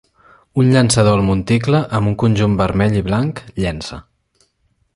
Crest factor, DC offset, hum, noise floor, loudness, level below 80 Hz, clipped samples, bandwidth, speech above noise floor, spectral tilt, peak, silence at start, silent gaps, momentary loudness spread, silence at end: 16 dB; under 0.1%; none; -63 dBFS; -16 LUFS; -36 dBFS; under 0.1%; 11.5 kHz; 48 dB; -6 dB/octave; 0 dBFS; 0.55 s; none; 11 LU; 0.95 s